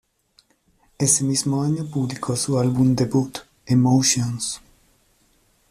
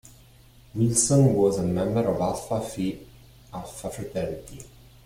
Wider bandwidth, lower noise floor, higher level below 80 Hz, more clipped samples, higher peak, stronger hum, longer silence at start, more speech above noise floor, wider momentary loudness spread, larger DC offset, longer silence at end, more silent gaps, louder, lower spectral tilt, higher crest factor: second, 14.5 kHz vs 16 kHz; first, -62 dBFS vs -53 dBFS; about the same, -54 dBFS vs -50 dBFS; neither; about the same, -4 dBFS vs -6 dBFS; neither; first, 1 s vs 0.75 s; first, 42 dB vs 28 dB; second, 10 LU vs 20 LU; neither; first, 1.15 s vs 0.4 s; neither; first, -20 LUFS vs -24 LUFS; about the same, -5 dB/octave vs -6 dB/octave; about the same, 18 dB vs 20 dB